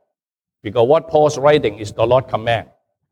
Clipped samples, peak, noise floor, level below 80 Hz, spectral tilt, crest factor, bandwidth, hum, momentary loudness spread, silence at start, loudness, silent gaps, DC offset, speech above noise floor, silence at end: under 0.1%; -2 dBFS; -87 dBFS; -50 dBFS; -5.5 dB/octave; 16 dB; 10.5 kHz; none; 9 LU; 0.65 s; -16 LUFS; none; under 0.1%; 72 dB; 0.5 s